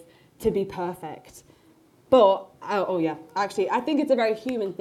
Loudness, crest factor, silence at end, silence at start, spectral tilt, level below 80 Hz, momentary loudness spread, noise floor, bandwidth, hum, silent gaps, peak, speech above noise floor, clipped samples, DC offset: -24 LUFS; 20 dB; 0.05 s; 0.4 s; -6 dB/octave; -58 dBFS; 14 LU; -57 dBFS; 14 kHz; none; none; -6 dBFS; 33 dB; under 0.1%; under 0.1%